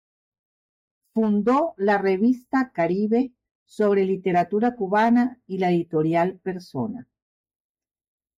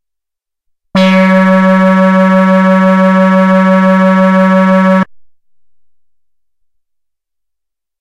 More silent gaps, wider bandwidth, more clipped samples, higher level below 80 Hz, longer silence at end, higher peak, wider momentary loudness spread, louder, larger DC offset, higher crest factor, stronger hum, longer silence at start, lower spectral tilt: first, 3.51-3.66 s vs none; first, 11.5 kHz vs 7.4 kHz; neither; second, -66 dBFS vs -54 dBFS; second, 1.35 s vs 2.95 s; second, -10 dBFS vs 0 dBFS; first, 10 LU vs 3 LU; second, -23 LUFS vs -7 LUFS; neither; about the same, 12 dB vs 10 dB; neither; first, 1.15 s vs 0.95 s; about the same, -8 dB/octave vs -8 dB/octave